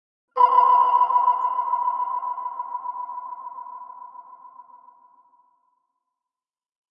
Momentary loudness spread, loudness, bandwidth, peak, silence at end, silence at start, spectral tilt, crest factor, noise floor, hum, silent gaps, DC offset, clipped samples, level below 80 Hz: 22 LU; -21 LUFS; 5.2 kHz; -6 dBFS; 2.15 s; 0.35 s; -3.5 dB/octave; 20 dB; under -90 dBFS; none; none; under 0.1%; under 0.1%; under -90 dBFS